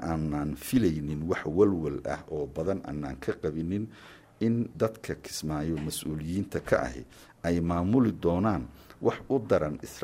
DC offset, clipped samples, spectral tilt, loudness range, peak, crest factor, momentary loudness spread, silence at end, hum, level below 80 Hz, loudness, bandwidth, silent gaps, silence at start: under 0.1%; under 0.1%; -6.5 dB/octave; 4 LU; -10 dBFS; 20 dB; 10 LU; 0 s; none; -48 dBFS; -30 LUFS; 16 kHz; none; 0 s